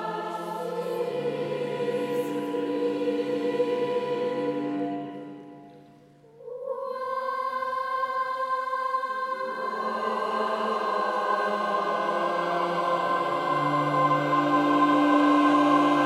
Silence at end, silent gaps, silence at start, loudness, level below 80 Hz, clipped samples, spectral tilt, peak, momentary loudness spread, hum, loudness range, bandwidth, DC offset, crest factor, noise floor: 0 s; none; 0 s; -26 LUFS; -78 dBFS; under 0.1%; -6 dB/octave; -10 dBFS; 11 LU; none; 9 LU; 13.5 kHz; under 0.1%; 16 dB; -53 dBFS